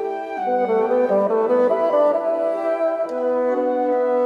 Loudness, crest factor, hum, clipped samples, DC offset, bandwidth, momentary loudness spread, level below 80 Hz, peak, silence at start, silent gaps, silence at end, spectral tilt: -20 LUFS; 12 dB; none; under 0.1%; under 0.1%; 5.8 kHz; 5 LU; -68 dBFS; -8 dBFS; 0 s; none; 0 s; -7.5 dB/octave